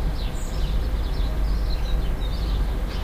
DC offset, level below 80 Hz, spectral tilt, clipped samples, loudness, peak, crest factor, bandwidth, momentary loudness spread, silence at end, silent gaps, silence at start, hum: under 0.1%; -24 dBFS; -6 dB/octave; under 0.1%; -28 LUFS; -12 dBFS; 12 dB; 15.5 kHz; 3 LU; 0 s; none; 0 s; none